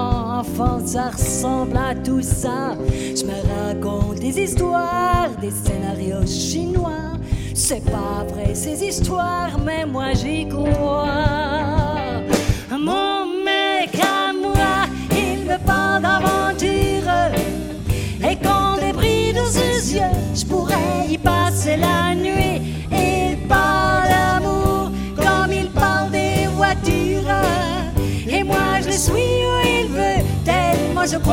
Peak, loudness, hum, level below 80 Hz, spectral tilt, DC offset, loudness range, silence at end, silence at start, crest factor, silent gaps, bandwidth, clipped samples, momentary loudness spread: -2 dBFS; -19 LUFS; none; -30 dBFS; -4.5 dB/octave; under 0.1%; 4 LU; 0 s; 0 s; 16 dB; none; 17 kHz; under 0.1%; 6 LU